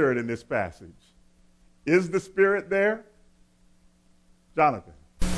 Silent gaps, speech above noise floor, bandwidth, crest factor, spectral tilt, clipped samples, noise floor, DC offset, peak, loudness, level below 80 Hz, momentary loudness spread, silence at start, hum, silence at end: none; 35 dB; 11 kHz; 18 dB; -6 dB/octave; under 0.1%; -60 dBFS; under 0.1%; -8 dBFS; -26 LUFS; -42 dBFS; 12 LU; 0 s; none; 0 s